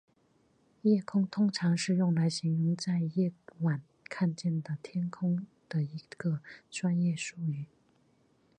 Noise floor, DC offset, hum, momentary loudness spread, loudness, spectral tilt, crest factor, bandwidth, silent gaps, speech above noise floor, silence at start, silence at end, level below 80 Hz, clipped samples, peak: -69 dBFS; under 0.1%; none; 9 LU; -32 LUFS; -6.5 dB/octave; 16 dB; 9.6 kHz; none; 38 dB; 0.85 s; 0.95 s; -76 dBFS; under 0.1%; -16 dBFS